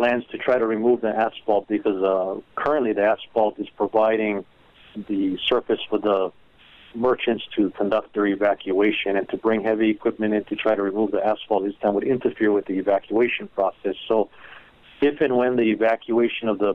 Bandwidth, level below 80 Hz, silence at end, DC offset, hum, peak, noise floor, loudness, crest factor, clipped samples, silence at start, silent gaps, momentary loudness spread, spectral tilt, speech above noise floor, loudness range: 5.2 kHz; -60 dBFS; 0 s; under 0.1%; none; -6 dBFS; -50 dBFS; -22 LUFS; 16 dB; under 0.1%; 0 s; none; 5 LU; -7.5 dB/octave; 29 dB; 2 LU